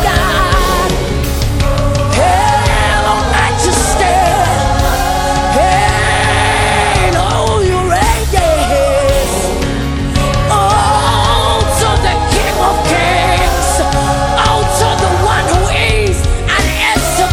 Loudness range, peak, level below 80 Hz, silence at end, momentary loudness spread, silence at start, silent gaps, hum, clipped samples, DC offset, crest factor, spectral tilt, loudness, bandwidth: 1 LU; 0 dBFS; -18 dBFS; 0 s; 3 LU; 0 s; none; none; under 0.1%; under 0.1%; 10 dB; -4 dB/octave; -11 LUFS; 18 kHz